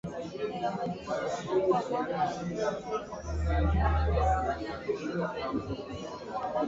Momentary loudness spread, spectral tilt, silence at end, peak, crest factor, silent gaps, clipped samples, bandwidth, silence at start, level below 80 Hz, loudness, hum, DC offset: 10 LU; -7 dB/octave; 0 s; -16 dBFS; 16 dB; none; under 0.1%; 7.8 kHz; 0.05 s; -36 dBFS; -32 LUFS; none; under 0.1%